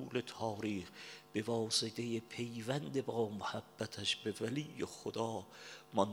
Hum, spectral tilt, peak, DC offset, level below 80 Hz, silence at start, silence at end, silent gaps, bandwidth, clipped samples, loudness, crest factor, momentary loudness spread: none; -4 dB/octave; -16 dBFS; under 0.1%; -78 dBFS; 0 s; 0 s; none; 20 kHz; under 0.1%; -40 LUFS; 24 dB; 10 LU